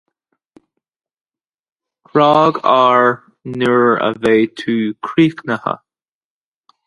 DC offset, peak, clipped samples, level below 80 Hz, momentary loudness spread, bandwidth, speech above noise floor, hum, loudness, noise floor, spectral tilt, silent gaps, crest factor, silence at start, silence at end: under 0.1%; 0 dBFS; under 0.1%; -58 dBFS; 10 LU; 11.5 kHz; over 76 dB; none; -14 LUFS; under -90 dBFS; -7 dB/octave; none; 16 dB; 2.15 s; 1.1 s